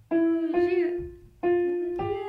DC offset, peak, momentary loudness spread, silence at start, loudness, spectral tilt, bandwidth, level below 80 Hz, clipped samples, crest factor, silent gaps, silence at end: under 0.1%; -14 dBFS; 8 LU; 0.1 s; -26 LUFS; -8.5 dB/octave; 4.7 kHz; -54 dBFS; under 0.1%; 12 dB; none; 0 s